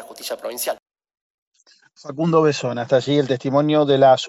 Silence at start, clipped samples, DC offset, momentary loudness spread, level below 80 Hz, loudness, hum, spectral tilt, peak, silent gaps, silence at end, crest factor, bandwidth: 0 s; under 0.1%; under 0.1%; 15 LU; -66 dBFS; -19 LUFS; none; -5.5 dB/octave; -4 dBFS; 0.82-0.86 s, 1.21-1.51 s; 0 s; 16 dB; 16 kHz